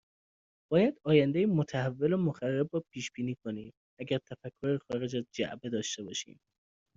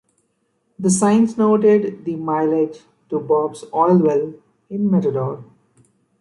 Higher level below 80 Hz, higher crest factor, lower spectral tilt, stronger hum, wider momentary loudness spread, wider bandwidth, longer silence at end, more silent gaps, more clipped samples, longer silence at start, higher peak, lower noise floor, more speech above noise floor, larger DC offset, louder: second, -70 dBFS vs -64 dBFS; first, 22 dB vs 16 dB; about the same, -6 dB/octave vs -7 dB/octave; neither; about the same, 13 LU vs 12 LU; second, 7.8 kHz vs 11.5 kHz; about the same, 0.75 s vs 0.8 s; first, 3.77-3.97 s vs none; neither; about the same, 0.7 s vs 0.8 s; second, -12 dBFS vs -4 dBFS; first, under -90 dBFS vs -67 dBFS; first, over 59 dB vs 50 dB; neither; second, -32 LUFS vs -18 LUFS